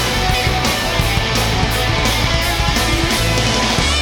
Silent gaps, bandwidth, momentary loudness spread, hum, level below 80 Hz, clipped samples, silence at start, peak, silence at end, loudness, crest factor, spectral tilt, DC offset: none; 19.5 kHz; 1 LU; none; -22 dBFS; under 0.1%; 0 s; 0 dBFS; 0 s; -15 LUFS; 16 dB; -3.5 dB/octave; under 0.1%